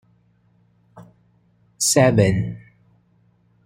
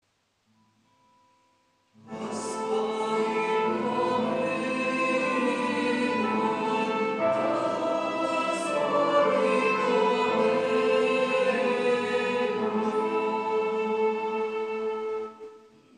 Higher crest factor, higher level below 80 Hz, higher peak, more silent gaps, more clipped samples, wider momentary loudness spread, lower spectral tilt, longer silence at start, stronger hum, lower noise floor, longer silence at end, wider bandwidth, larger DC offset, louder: about the same, 20 dB vs 16 dB; first, -50 dBFS vs -82 dBFS; first, -2 dBFS vs -10 dBFS; neither; neither; first, 16 LU vs 7 LU; about the same, -4.5 dB/octave vs -4.5 dB/octave; second, 0.95 s vs 2.05 s; neither; second, -60 dBFS vs -71 dBFS; first, 1.05 s vs 0.4 s; first, 16 kHz vs 10.5 kHz; neither; first, -18 LUFS vs -26 LUFS